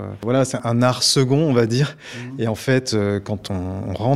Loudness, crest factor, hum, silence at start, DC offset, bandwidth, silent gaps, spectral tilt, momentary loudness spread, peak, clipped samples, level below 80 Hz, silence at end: -20 LUFS; 18 dB; none; 0 s; 0.1%; 15 kHz; none; -5 dB/octave; 10 LU; -2 dBFS; under 0.1%; -52 dBFS; 0 s